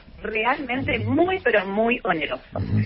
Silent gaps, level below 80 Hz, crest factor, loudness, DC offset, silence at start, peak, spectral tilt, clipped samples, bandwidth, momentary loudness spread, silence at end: none; -46 dBFS; 16 dB; -23 LUFS; under 0.1%; 0.05 s; -6 dBFS; -11 dB/octave; under 0.1%; 5.8 kHz; 7 LU; 0 s